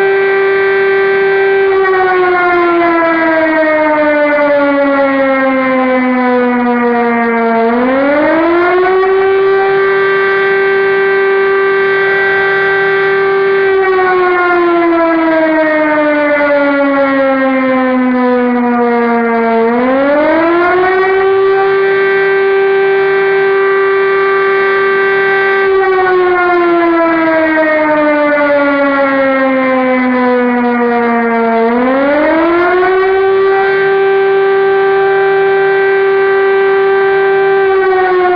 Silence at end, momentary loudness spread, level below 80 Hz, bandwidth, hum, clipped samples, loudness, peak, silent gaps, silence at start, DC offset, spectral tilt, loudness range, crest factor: 0 s; 1 LU; -48 dBFS; 5.2 kHz; none; under 0.1%; -10 LUFS; -2 dBFS; none; 0 s; under 0.1%; -7.5 dB/octave; 1 LU; 8 dB